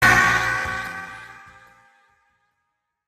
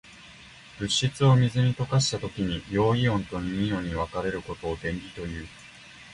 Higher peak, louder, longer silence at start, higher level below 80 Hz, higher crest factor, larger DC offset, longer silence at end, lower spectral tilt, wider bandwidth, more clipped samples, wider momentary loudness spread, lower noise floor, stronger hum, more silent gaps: first, -2 dBFS vs -8 dBFS; first, -20 LUFS vs -26 LUFS; about the same, 0 s vs 0.05 s; about the same, -46 dBFS vs -46 dBFS; about the same, 22 dB vs 18 dB; neither; first, 1.75 s vs 0 s; second, -3 dB/octave vs -5.5 dB/octave; first, 15.5 kHz vs 11 kHz; neither; about the same, 24 LU vs 24 LU; first, -77 dBFS vs -49 dBFS; neither; neither